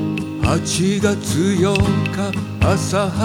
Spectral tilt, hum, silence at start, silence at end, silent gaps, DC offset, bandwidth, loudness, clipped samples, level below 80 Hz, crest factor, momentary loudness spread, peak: -5.5 dB/octave; none; 0 s; 0 s; none; under 0.1%; 16.5 kHz; -18 LUFS; under 0.1%; -34 dBFS; 14 dB; 5 LU; -4 dBFS